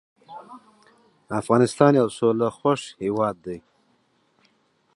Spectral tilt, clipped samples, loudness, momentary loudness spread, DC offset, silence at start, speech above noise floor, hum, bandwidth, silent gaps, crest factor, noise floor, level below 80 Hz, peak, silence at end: -6.5 dB/octave; under 0.1%; -22 LUFS; 25 LU; under 0.1%; 0.3 s; 44 dB; none; 11.5 kHz; none; 24 dB; -65 dBFS; -64 dBFS; -2 dBFS; 1.35 s